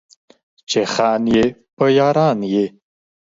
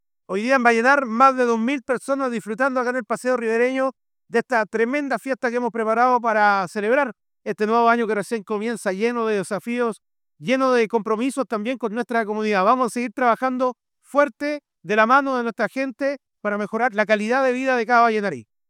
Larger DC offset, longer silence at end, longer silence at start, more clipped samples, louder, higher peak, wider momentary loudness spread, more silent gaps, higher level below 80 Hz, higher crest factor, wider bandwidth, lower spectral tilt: neither; first, 0.6 s vs 0.3 s; first, 0.7 s vs 0.3 s; neither; first, -17 LUFS vs -21 LUFS; about the same, -2 dBFS vs -2 dBFS; about the same, 7 LU vs 9 LU; first, 1.73-1.77 s vs none; first, -50 dBFS vs -74 dBFS; about the same, 16 dB vs 18 dB; second, 7.8 kHz vs 14.5 kHz; about the same, -5.5 dB/octave vs -5 dB/octave